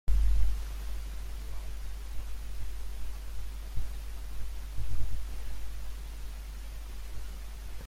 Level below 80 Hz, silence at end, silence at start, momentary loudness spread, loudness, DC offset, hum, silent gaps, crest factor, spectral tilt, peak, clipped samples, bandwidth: -36 dBFS; 0 s; 0.05 s; 9 LU; -40 LUFS; under 0.1%; none; none; 16 dB; -5 dB/octave; -12 dBFS; under 0.1%; 15.5 kHz